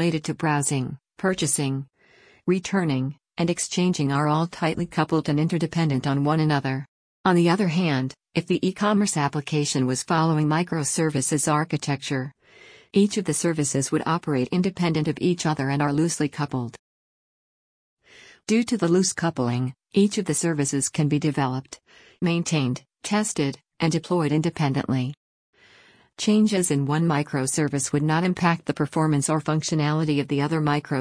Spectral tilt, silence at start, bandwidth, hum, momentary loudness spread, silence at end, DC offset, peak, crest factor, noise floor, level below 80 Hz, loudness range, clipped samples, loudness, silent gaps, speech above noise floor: -5 dB/octave; 0 s; 10.5 kHz; none; 7 LU; 0 s; under 0.1%; -6 dBFS; 16 dB; -56 dBFS; -60 dBFS; 3 LU; under 0.1%; -24 LUFS; 6.88-7.24 s, 16.79-17.97 s, 25.17-25.53 s; 33 dB